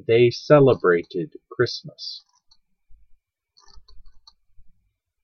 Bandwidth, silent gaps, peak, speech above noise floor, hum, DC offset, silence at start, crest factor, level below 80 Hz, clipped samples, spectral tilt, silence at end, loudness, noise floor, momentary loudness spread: 6.6 kHz; none; -2 dBFS; 50 dB; none; under 0.1%; 0.1 s; 20 dB; -56 dBFS; under 0.1%; -7 dB/octave; 1.15 s; -19 LUFS; -69 dBFS; 19 LU